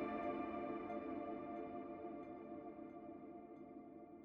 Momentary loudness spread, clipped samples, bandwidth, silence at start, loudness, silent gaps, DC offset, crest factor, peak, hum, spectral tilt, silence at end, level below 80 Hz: 12 LU; under 0.1%; 5.4 kHz; 0 s; -49 LUFS; none; under 0.1%; 16 dB; -32 dBFS; none; -6 dB/octave; 0 s; -76 dBFS